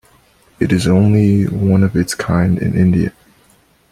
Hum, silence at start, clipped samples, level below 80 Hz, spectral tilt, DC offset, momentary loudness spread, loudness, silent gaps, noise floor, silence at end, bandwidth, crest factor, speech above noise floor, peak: none; 0.6 s; under 0.1%; -40 dBFS; -7 dB/octave; under 0.1%; 6 LU; -14 LUFS; none; -52 dBFS; 0.8 s; 13.5 kHz; 12 dB; 40 dB; -2 dBFS